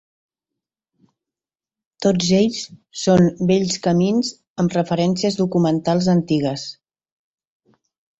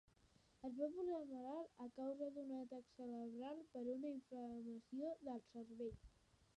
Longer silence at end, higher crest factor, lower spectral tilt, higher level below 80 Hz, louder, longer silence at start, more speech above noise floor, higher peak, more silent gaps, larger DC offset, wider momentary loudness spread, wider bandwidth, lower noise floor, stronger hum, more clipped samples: first, 1.5 s vs 0.15 s; about the same, 18 dB vs 18 dB; about the same, -6 dB/octave vs -7 dB/octave; first, -54 dBFS vs -76 dBFS; first, -19 LUFS vs -51 LUFS; first, 2 s vs 0.6 s; first, over 72 dB vs 26 dB; first, -4 dBFS vs -34 dBFS; first, 4.50-4.56 s vs none; neither; about the same, 9 LU vs 7 LU; second, 8 kHz vs 10.5 kHz; first, under -90 dBFS vs -75 dBFS; neither; neither